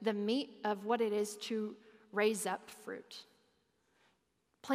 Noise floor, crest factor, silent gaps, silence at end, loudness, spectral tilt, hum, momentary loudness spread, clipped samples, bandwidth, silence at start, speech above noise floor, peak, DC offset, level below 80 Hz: -79 dBFS; 20 dB; none; 0 s; -37 LUFS; -4 dB/octave; none; 18 LU; under 0.1%; 15.5 kHz; 0 s; 43 dB; -20 dBFS; under 0.1%; under -90 dBFS